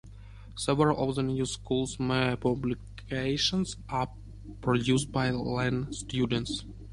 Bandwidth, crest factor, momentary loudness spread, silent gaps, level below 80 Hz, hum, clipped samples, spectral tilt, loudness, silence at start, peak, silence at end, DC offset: 11.5 kHz; 20 dB; 11 LU; none; -48 dBFS; none; under 0.1%; -5 dB/octave; -30 LUFS; 0.05 s; -10 dBFS; 0 s; under 0.1%